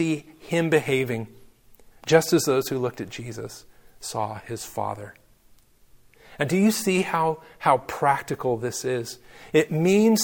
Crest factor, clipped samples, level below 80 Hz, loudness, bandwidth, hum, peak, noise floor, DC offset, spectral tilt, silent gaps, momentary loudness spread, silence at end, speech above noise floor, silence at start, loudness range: 22 dB; under 0.1%; -60 dBFS; -24 LUFS; 17.5 kHz; none; -2 dBFS; -56 dBFS; under 0.1%; -5 dB/octave; none; 16 LU; 0 s; 32 dB; 0 s; 9 LU